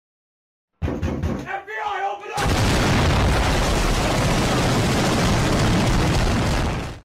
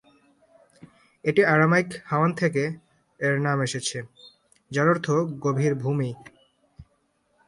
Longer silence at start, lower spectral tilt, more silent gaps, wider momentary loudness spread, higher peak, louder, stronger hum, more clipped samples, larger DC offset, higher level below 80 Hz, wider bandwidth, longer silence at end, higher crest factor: second, 0.8 s vs 1.25 s; about the same, -5 dB/octave vs -6 dB/octave; neither; second, 8 LU vs 12 LU; second, -12 dBFS vs -6 dBFS; first, -21 LUFS vs -24 LUFS; neither; neither; neither; first, -28 dBFS vs -64 dBFS; first, 16 kHz vs 11.5 kHz; second, 0.05 s vs 0.65 s; second, 8 dB vs 20 dB